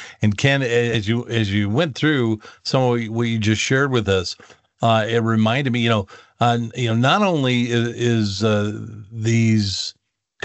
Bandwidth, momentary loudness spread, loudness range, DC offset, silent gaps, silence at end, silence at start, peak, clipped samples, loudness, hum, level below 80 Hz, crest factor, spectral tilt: 8.2 kHz; 7 LU; 1 LU; under 0.1%; none; 0.55 s; 0 s; -2 dBFS; under 0.1%; -19 LUFS; none; -56 dBFS; 18 dB; -5.5 dB/octave